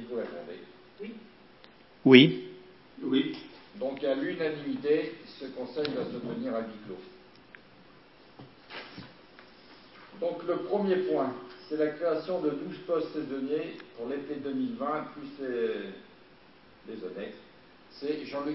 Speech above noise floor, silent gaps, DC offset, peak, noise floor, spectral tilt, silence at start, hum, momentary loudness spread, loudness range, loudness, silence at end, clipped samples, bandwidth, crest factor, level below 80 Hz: 28 dB; none; under 0.1%; -2 dBFS; -57 dBFS; -9.5 dB/octave; 0 s; none; 17 LU; 14 LU; -30 LUFS; 0 s; under 0.1%; 5.8 kHz; 30 dB; -74 dBFS